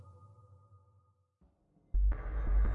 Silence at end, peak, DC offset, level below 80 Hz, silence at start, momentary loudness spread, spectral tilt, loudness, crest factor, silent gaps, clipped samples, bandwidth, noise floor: 0 s; -22 dBFS; under 0.1%; -36 dBFS; 0.05 s; 23 LU; -10 dB/octave; -36 LUFS; 14 dB; none; under 0.1%; 2.4 kHz; -71 dBFS